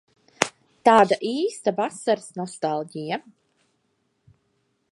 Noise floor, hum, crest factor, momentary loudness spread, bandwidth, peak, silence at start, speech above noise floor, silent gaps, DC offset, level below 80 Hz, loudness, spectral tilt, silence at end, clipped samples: -71 dBFS; none; 24 dB; 14 LU; 16 kHz; 0 dBFS; 0.4 s; 49 dB; none; under 0.1%; -70 dBFS; -23 LUFS; -4 dB/octave; 1.7 s; under 0.1%